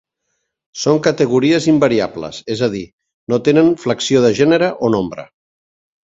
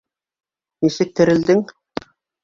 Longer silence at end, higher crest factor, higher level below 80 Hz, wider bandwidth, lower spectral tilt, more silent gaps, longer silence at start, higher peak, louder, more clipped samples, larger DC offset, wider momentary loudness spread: about the same, 0.8 s vs 0.8 s; about the same, 16 dB vs 18 dB; about the same, -52 dBFS vs -56 dBFS; about the same, 7.8 kHz vs 7.6 kHz; about the same, -5.5 dB/octave vs -6.5 dB/octave; first, 2.93-2.98 s, 3.14-3.27 s vs none; about the same, 0.75 s vs 0.8 s; about the same, 0 dBFS vs -2 dBFS; about the same, -15 LUFS vs -17 LUFS; neither; neither; second, 14 LU vs 17 LU